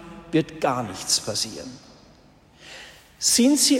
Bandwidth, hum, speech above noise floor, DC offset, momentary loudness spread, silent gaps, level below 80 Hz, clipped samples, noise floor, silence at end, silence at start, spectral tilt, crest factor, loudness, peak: 16 kHz; none; 31 dB; under 0.1%; 24 LU; none; -58 dBFS; under 0.1%; -53 dBFS; 0 s; 0 s; -2.5 dB/octave; 20 dB; -22 LUFS; -4 dBFS